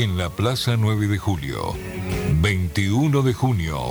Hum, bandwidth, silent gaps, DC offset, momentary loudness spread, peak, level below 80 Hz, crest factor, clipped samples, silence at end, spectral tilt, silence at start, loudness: none; over 20 kHz; none; under 0.1%; 8 LU; -6 dBFS; -36 dBFS; 14 dB; under 0.1%; 0 s; -6 dB/octave; 0 s; -22 LUFS